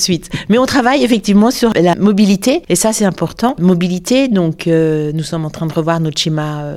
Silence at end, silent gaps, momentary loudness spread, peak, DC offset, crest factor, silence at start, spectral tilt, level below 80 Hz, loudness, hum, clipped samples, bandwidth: 0 s; none; 7 LU; 0 dBFS; under 0.1%; 12 dB; 0 s; -5 dB/octave; -42 dBFS; -13 LUFS; none; under 0.1%; 16 kHz